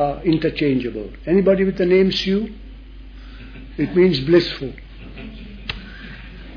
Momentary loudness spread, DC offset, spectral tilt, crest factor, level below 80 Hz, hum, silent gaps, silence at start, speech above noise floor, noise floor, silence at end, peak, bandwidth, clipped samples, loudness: 23 LU; under 0.1%; -7.5 dB/octave; 16 dB; -38 dBFS; none; none; 0 s; 20 dB; -37 dBFS; 0 s; -4 dBFS; 5.4 kHz; under 0.1%; -19 LUFS